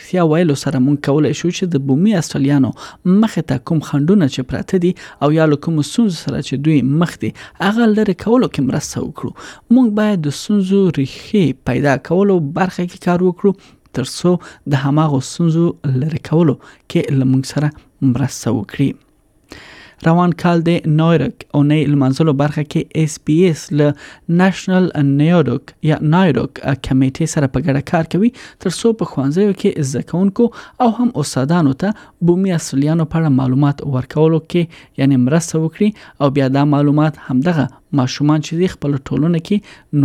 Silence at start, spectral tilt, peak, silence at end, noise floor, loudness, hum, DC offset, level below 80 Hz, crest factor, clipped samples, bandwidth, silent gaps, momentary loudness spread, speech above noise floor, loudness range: 0 s; -7 dB/octave; -2 dBFS; 0 s; -43 dBFS; -16 LUFS; none; under 0.1%; -46 dBFS; 14 dB; under 0.1%; 13.5 kHz; none; 7 LU; 29 dB; 2 LU